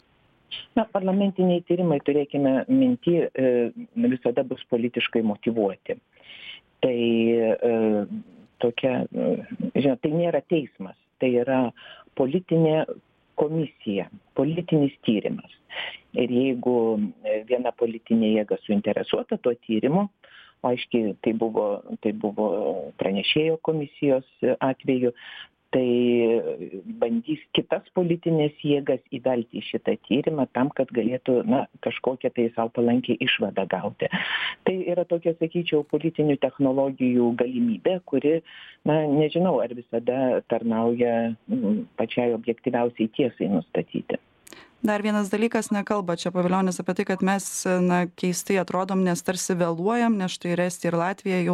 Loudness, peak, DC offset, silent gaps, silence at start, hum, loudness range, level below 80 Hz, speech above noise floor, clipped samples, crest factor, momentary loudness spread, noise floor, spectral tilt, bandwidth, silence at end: -24 LUFS; -8 dBFS; under 0.1%; none; 0.5 s; none; 3 LU; -66 dBFS; 38 dB; under 0.1%; 16 dB; 7 LU; -62 dBFS; -6 dB/octave; 14 kHz; 0 s